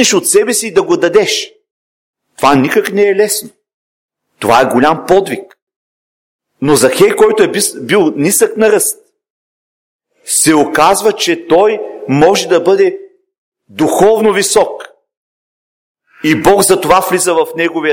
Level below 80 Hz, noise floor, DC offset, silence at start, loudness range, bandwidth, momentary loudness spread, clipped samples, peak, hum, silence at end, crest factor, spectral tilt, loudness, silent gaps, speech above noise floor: -44 dBFS; under -90 dBFS; under 0.1%; 0 s; 3 LU; 17 kHz; 9 LU; 0.1%; 0 dBFS; none; 0 s; 12 dB; -3.5 dB/octave; -10 LUFS; 1.71-2.13 s, 3.74-4.09 s, 5.62-5.67 s, 5.76-6.39 s, 9.30-9.99 s, 13.38-13.52 s, 15.17-15.95 s; over 80 dB